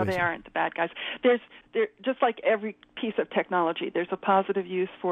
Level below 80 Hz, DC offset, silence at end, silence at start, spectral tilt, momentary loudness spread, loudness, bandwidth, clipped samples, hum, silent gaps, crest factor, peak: -66 dBFS; under 0.1%; 0 s; 0 s; -6.5 dB/octave; 6 LU; -28 LUFS; 10 kHz; under 0.1%; none; none; 18 dB; -10 dBFS